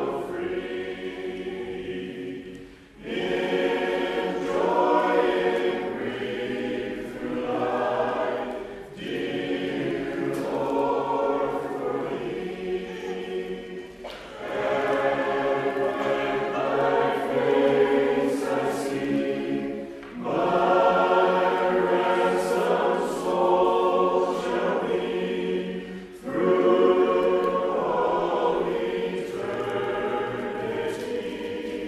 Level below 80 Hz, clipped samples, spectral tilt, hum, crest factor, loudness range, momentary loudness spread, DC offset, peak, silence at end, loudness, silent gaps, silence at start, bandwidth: -58 dBFS; under 0.1%; -6 dB/octave; none; 18 dB; 6 LU; 12 LU; under 0.1%; -8 dBFS; 0 s; -25 LUFS; none; 0 s; 13.5 kHz